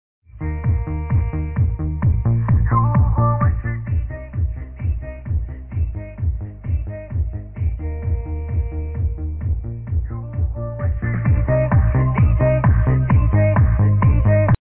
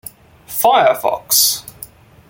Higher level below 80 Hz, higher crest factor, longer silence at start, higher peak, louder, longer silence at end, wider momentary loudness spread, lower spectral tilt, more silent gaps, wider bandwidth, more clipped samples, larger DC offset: first, -24 dBFS vs -54 dBFS; second, 12 dB vs 18 dB; second, 0.35 s vs 0.5 s; second, -6 dBFS vs 0 dBFS; second, -20 LUFS vs -14 LUFS; second, 0.05 s vs 0.45 s; second, 10 LU vs 17 LU; first, -13.5 dB/octave vs -0.5 dB/octave; neither; second, 3 kHz vs 17 kHz; neither; neither